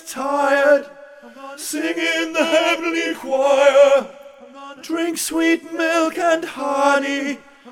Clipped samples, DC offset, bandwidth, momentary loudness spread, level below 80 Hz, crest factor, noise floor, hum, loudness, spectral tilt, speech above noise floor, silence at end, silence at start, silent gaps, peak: under 0.1%; under 0.1%; 17 kHz; 17 LU; -66 dBFS; 16 dB; -39 dBFS; none; -18 LUFS; -1.5 dB/octave; 22 dB; 0 s; 0.05 s; none; -2 dBFS